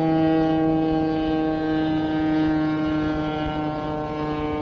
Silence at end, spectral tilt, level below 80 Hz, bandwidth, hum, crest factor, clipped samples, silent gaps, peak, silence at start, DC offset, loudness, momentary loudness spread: 0 s; -6 dB/octave; -42 dBFS; 6.2 kHz; none; 12 dB; under 0.1%; none; -10 dBFS; 0 s; under 0.1%; -23 LUFS; 7 LU